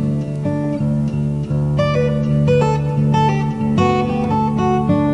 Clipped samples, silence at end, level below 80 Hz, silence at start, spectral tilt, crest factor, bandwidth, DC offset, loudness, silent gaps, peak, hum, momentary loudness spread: under 0.1%; 0 s; -38 dBFS; 0 s; -8.5 dB/octave; 12 dB; 9.4 kHz; 0.2%; -17 LUFS; none; -4 dBFS; none; 5 LU